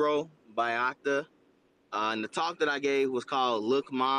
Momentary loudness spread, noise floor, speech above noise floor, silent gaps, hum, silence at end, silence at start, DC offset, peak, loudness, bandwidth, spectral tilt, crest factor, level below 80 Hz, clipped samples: 5 LU; -66 dBFS; 37 dB; none; none; 0 s; 0 s; under 0.1%; -16 dBFS; -30 LUFS; 10 kHz; -4 dB/octave; 14 dB; -82 dBFS; under 0.1%